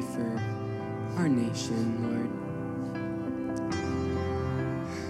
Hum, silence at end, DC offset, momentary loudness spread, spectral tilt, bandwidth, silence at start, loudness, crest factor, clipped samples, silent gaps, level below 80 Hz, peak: none; 0 s; under 0.1%; 7 LU; -6.5 dB/octave; 13.5 kHz; 0 s; -32 LUFS; 14 dB; under 0.1%; none; -52 dBFS; -16 dBFS